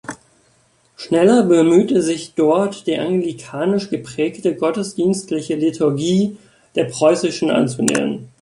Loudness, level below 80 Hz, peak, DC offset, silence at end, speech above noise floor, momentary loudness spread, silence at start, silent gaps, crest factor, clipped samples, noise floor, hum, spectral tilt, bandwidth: -17 LUFS; -60 dBFS; 0 dBFS; under 0.1%; 0.15 s; 41 dB; 10 LU; 0.1 s; none; 18 dB; under 0.1%; -57 dBFS; none; -5.5 dB/octave; 11.5 kHz